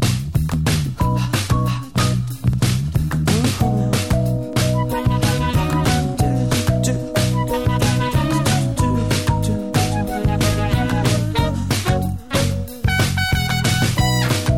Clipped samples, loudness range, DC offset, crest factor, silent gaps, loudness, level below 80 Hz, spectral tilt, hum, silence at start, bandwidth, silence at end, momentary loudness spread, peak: under 0.1%; 1 LU; 0.7%; 12 dB; none; -19 LUFS; -30 dBFS; -5.5 dB/octave; none; 0 s; 17 kHz; 0 s; 3 LU; -6 dBFS